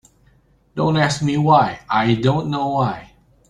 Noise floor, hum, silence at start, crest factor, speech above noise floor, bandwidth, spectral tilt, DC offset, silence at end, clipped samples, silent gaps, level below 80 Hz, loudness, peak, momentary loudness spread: -56 dBFS; none; 0.75 s; 18 dB; 38 dB; 11 kHz; -6 dB/octave; under 0.1%; 0.45 s; under 0.1%; none; -50 dBFS; -18 LUFS; -2 dBFS; 8 LU